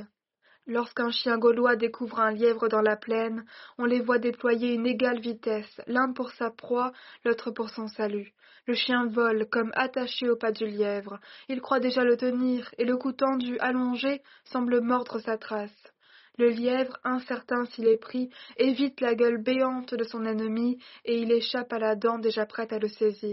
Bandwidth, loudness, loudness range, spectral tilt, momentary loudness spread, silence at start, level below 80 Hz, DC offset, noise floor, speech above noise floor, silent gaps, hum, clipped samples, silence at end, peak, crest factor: 5.8 kHz; -28 LUFS; 3 LU; -2.5 dB/octave; 10 LU; 0 s; -76 dBFS; under 0.1%; -66 dBFS; 39 dB; none; none; under 0.1%; 0 s; -10 dBFS; 18 dB